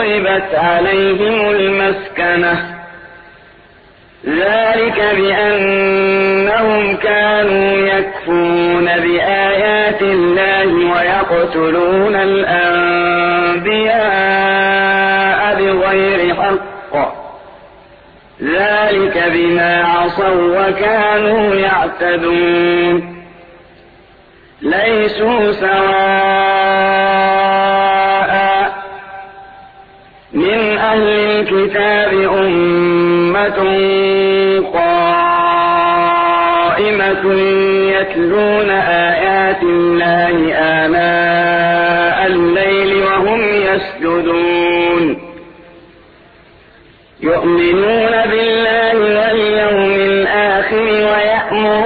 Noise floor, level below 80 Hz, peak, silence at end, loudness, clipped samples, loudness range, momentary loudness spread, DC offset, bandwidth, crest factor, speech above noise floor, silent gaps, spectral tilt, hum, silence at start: -44 dBFS; -44 dBFS; -2 dBFS; 0 s; -12 LUFS; under 0.1%; 4 LU; 3 LU; under 0.1%; 4.9 kHz; 12 dB; 32 dB; none; -8 dB/octave; none; 0 s